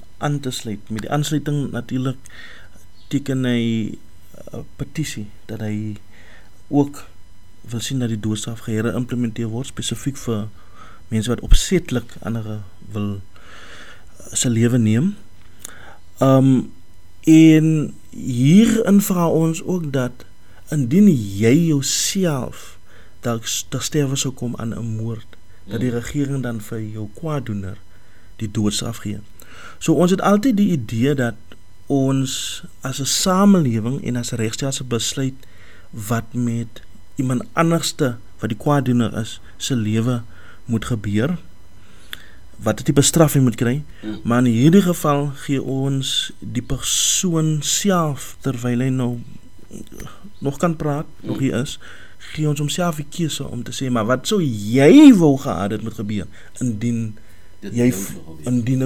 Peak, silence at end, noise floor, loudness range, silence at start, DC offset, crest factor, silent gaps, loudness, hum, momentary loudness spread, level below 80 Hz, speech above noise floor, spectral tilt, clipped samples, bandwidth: 0 dBFS; 0 s; -48 dBFS; 10 LU; 0.2 s; 2%; 20 dB; none; -19 LUFS; none; 17 LU; -36 dBFS; 29 dB; -5.5 dB/octave; under 0.1%; 19 kHz